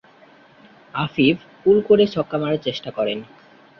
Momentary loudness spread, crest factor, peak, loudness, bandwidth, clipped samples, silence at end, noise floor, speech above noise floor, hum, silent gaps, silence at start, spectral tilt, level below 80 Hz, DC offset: 11 LU; 18 dB; -4 dBFS; -20 LUFS; 6.4 kHz; under 0.1%; 0.55 s; -50 dBFS; 31 dB; none; none; 0.95 s; -7.5 dB/octave; -58 dBFS; under 0.1%